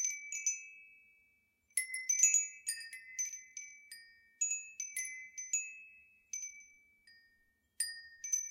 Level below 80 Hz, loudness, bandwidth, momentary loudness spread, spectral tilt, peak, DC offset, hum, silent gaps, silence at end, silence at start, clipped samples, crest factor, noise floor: -88 dBFS; -36 LUFS; 16.5 kHz; 24 LU; 6 dB/octave; -16 dBFS; under 0.1%; none; none; 0 s; 0 s; under 0.1%; 26 dB; -75 dBFS